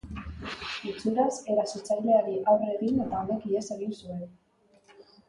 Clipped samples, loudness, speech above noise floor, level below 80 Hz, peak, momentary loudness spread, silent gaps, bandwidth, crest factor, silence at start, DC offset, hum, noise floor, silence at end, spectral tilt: under 0.1%; -28 LUFS; 34 dB; -54 dBFS; -12 dBFS; 14 LU; none; 11 kHz; 18 dB; 0.05 s; under 0.1%; none; -61 dBFS; 0.25 s; -5.5 dB/octave